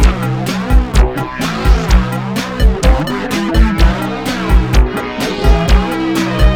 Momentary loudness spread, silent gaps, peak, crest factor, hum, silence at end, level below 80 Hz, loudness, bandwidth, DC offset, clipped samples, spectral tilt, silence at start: 6 LU; none; 0 dBFS; 12 dB; none; 0 s; -14 dBFS; -14 LUFS; 15.5 kHz; under 0.1%; 0.2%; -6 dB/octave; 0 s